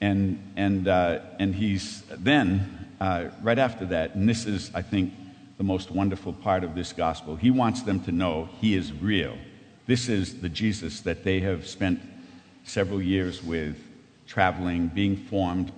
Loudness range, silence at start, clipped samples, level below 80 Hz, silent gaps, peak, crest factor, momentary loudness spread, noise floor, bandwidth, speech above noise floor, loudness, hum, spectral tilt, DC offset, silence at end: 3 LU; 0 s; under 0.1%; -50 dBFS; none; -4 dBFS; 22 dB; 9 LU; -48 dBFS; 9.4 kHz; 23 dB; -27 LUFS; none; -6 dB/octave; under 0.1%; 0 s